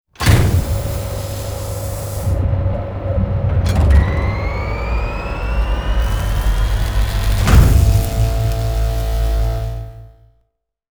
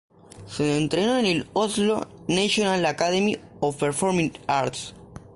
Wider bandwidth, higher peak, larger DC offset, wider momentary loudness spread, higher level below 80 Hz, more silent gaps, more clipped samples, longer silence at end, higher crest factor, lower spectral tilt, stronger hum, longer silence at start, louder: first, over 20 kHz vs 11.5 kHz; first, 0 dBFS vs -8 dBFS; neither; first, 11 LU vs 7 LU; first, -18 dBFS vs -54 dBFS; neither; neither; first, 0.8 s vs 0.15 s; about the same, 16 dB vs 16 dB; first, -6 dB/octave vs -4.5 dB/octave; neither; second, 0.2 s vs 0.35 s; first, -18 LUFS vs -24 LUFS